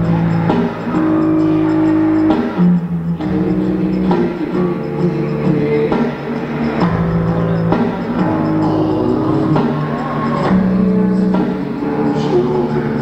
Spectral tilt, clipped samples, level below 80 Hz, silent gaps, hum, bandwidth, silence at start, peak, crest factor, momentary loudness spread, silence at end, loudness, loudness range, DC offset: -9.5 dB/octave; under 0.1%; -38 dBFS; none; none; 8 kHz; 0 s; 0 dBFS; 14 dB; 5 LU; 0 s; -15 LUFS; 2 LU; under 0.1%